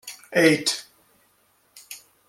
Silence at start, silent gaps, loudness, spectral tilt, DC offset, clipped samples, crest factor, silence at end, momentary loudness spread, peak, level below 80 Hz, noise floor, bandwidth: 0.05 s; none; -21 LUFS; -3.5 dB/octave; under 0.1%; under 0.1%; 22 dB; 0.3 s; 23 LU; -4 dBFS; -72 dBFS; -64 dBFS; 16 kHz